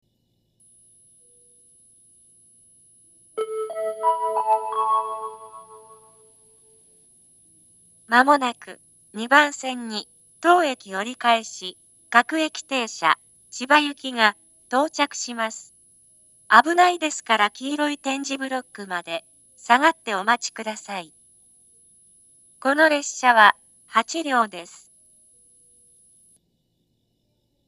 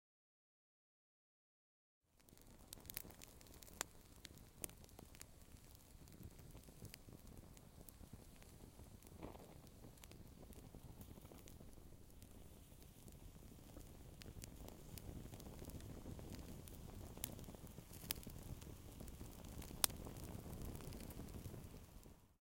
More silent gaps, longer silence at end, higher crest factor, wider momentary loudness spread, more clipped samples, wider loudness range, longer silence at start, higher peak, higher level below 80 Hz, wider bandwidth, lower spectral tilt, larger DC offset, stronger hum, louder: neither; first, 3.05 s vs 0.05 s; second, 24 dB vs 42 dB; first, 17 LU vs 12 LU; neither; second, 8 LU vs 13 LU; first, 3.35 s vs 2.1 s; first, 0 dBFS vs -12 dBFS; second, -80 dBFS vs -62 dBFS; second, 13.5 kHz vs 17 kHz; second, -1.5 dB/octave vs -3.5 dB/octave; neither; neither; first, -21 LUFS vs -54 LUFS